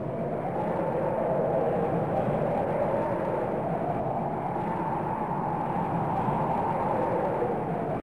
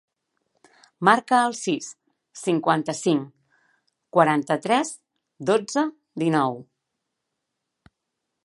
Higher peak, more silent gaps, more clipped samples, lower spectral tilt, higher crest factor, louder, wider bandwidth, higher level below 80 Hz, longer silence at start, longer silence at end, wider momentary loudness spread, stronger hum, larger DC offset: second, -16 dBFS vs -2 dBFS; neither; neither; first, -9.5 dB/octave vs -5 dB/octave; second, 12 dB vs 24 dB; second, -28 LUFS vs -23 LUFS; first, 13 kHz vs 11.5 kHz; first, -54 dBFS vs -74 dBFS; second, 0 s vs 1 s; second, 0 s vs 1.85 s; second, 3 LU vs 12 LU; neither; first, 0.2% vs under 0.1%